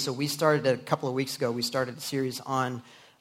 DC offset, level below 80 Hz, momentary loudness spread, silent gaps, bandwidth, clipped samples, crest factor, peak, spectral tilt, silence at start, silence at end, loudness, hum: under 0.1%; -70 dBFS; 7 LU; none; 16 kHz; under 0.1%; 20 dB; -8 dBFS; -4.5 dB/octave; 0 s; 0.25 s; -28 LUFS; none